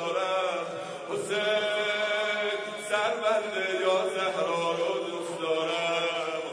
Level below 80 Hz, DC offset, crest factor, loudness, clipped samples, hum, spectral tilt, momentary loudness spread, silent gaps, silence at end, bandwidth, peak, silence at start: -78 dBFS; under 0.1%; 16 dB; -28 LUFS; under 0.1%; none; -3 dB/octave; 7 LU; none; 0 s; 11 kHz; -12 dBFS; 0 s